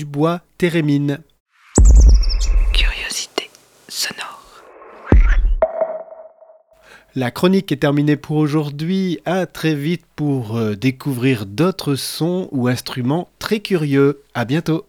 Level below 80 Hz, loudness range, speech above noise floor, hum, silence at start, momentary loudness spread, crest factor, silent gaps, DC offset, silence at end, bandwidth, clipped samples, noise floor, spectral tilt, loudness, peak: -20 dBFS; 5 LU; 30 dB; none; 0 s; 9 LU; 16 dB; 1.40-1.46 s; under 0.1%; 0.05 s; 15.5 kHz; under 0.1%; -48 dBFS; -5.5 dB/octave; -18 LUFS; 0 dBFS